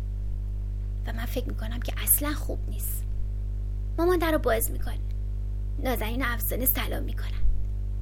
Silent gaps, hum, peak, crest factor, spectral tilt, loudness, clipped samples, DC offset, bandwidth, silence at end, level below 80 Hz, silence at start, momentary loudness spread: none; 50 Hz at -30 dBFS; -8 dBFS; 20 dB; -4.5 dB/octave; -29 LUFS; under 0.1%; under 0.1%; 18 kHz; 0 s; -30 dBFS; 0 s; 10 LU